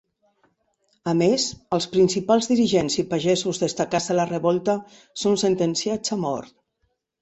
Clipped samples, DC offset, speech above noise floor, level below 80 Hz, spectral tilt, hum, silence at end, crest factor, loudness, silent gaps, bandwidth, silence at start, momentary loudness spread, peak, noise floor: under 0.1%; under 0.1%; 51 dB; -58 dBFS; -4.5 dB/octave; none; 0.75 s; 18 dB; -22 LUFS; none; 8.4 kHz; 1.05 s; 7 LU; -6 dBFS; -73 dBFS